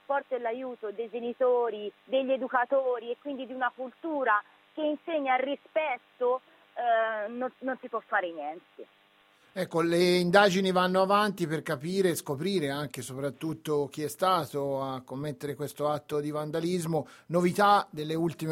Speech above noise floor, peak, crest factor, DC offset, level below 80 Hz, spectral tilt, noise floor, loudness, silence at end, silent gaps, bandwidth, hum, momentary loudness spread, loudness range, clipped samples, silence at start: 34 dB; -8 dBFS; 22 dB; under 0.1%; -72 dBFS; -5.5 dB/octave; -63 dBFS; -29 LUFS; 0 s; none; 16 kHz; none; 12 LU; 6 LU; under 0.1%; 0.1 s